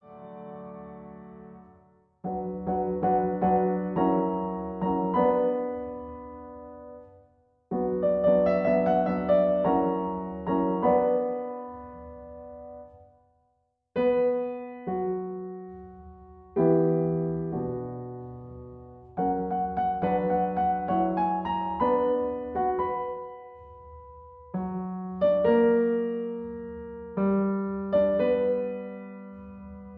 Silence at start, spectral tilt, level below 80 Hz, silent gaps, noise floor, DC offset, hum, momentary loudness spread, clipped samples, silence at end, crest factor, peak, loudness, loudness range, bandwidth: 0.05 s; -11 dB/octave; -54 dBFS; none; -73 dBFS; under 0.1%; none; 21 LU; under 0.1%; 0 s; 16 dB; -12 dBFS; -27 LUFS; 6 LU; 4.6 kHz